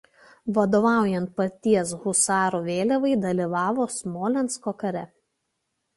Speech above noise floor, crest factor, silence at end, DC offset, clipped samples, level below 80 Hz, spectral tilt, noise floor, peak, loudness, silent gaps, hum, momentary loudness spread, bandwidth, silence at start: 54 dB; 16 dB; 0.9 s; under 0.1%; under 0.1%; -64 dBFS; -5 dB/octave; -77 dBFS; -8 dBFS; -24 LUFS; none; none; 9 LU; 12 kHz; 0.45 s